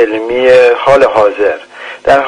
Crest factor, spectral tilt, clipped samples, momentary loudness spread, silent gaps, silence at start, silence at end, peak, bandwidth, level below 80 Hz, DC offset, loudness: 8 dB; -4.5 dB/octave; 0.4%; 12 LU; none; 0 s; 0 s; 0 dBFS; 10 kHz; -40 dBFS; under 0.1%; -8 LUFS